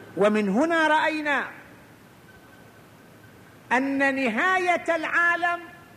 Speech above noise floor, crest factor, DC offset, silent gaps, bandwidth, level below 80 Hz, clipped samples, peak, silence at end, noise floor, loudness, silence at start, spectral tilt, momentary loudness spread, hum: 27 dB; 16 dB; under 0.1%; none; 15 kHz; -68 dBFS; under 0.1%; -8 dBFS; 0.15 s; -50 dBFS; -23 LUFS; 0 s; -5 dB/octave; 6 LU; none